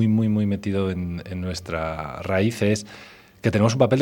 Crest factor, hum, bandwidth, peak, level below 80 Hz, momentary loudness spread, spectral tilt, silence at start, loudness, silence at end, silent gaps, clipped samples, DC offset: 18 dB; none; 17 kHz; -4 dBFS; -48 dBFS; 10 LU; -6.5 dB/octave; 0 s; -24 LUFS; 0 s; none; under 0.1%; under 0.1%